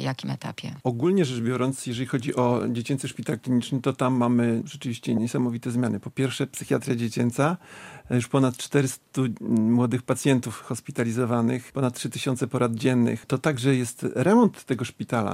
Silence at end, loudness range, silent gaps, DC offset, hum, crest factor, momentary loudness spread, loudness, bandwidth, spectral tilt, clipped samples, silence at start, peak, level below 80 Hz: 0 s; 2 LU; none; under 0.1%; none; 18 dB; 8 LU; -25 LUFS; 15.5 kHz; -6 dB/octave; under 0.1%; 0 s; -6 dBFS; -64 dBFS